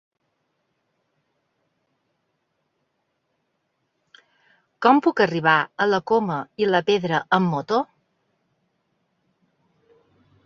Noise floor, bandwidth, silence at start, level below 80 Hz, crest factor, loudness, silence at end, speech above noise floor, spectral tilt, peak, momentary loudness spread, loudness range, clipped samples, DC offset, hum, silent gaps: -74 dBFS; 7.2 kHz; 4.8 s; -68 dBFS; 22 dB; -21 LUFS; 2.6 s; 54 dB; -6.5 dB/octave; -2 dBFS; 7 LU; 7 LU; under 0.1%; under 0.1%; none; none